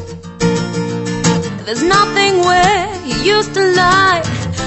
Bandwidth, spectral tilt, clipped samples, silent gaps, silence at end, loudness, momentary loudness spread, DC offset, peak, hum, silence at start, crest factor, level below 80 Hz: 8.4 kHz; -4 dB/octave; under 0.1%; none; 0 s; -13 LUFS; 9 LU; under 0.1%; 0 dBFS; none; 0 s; 14 dB; -36 dBFS